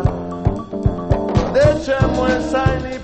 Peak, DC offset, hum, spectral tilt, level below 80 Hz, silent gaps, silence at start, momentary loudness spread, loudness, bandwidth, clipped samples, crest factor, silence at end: 0 dBFS; under 0.1%; none; -7 dB/octave; -28 dBFS; none; 0 s; 7 LU; -18 LUFS; 8.8 kHz; under 0.1%; 16 dB; 0 s